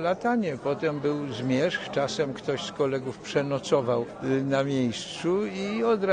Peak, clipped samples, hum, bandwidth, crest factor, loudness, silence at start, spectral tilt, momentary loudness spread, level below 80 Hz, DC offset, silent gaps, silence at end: -10 dBFS; under 0.1%; none; 10 kHz; 16 dB; -27 LUFS; 0 s; -5.5 dB/octave; 4 LU; -62 dBFS; under 0.1%; none; 0 s